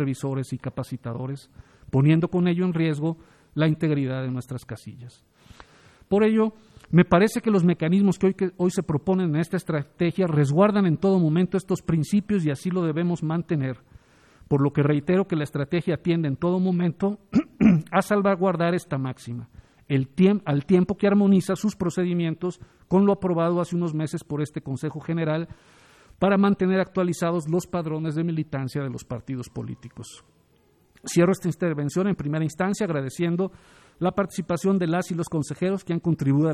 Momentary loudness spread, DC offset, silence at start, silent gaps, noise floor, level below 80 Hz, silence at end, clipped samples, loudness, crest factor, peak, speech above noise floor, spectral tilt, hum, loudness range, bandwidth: 12 LU; under 0.1%; 0 s; none; -61 dBFS; -56 dBFS; 0 s; under 0.1%; -24 LUFS; 20 dB; -4 dBFS; 38 dB; -7.5 dB/octave; none; 5 LU; 13.5 kHz